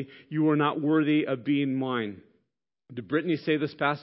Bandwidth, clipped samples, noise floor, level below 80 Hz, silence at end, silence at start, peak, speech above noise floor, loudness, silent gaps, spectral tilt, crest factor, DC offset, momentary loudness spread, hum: 5.8 kHz; under 0.1%; -80 dBFS; -74 dBFS; 0 s; 0 s; -10 dBFS; 54 dB; -27 LUFS; none; -11 dB/octave; 18 dB; under 0.1%; 10 LU; none